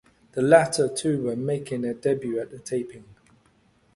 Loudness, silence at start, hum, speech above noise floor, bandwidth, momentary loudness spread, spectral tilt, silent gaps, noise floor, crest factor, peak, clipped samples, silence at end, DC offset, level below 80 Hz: -24 LUFS; 0.35 s; none; 38 dB; 11.5 kHz; 13 LU; -5.5 dB/octave; none; -62 dBFS; 22 dB; -2 dBFS; under 0.1%; 0.95 s; under 0.1%; -62 dBFS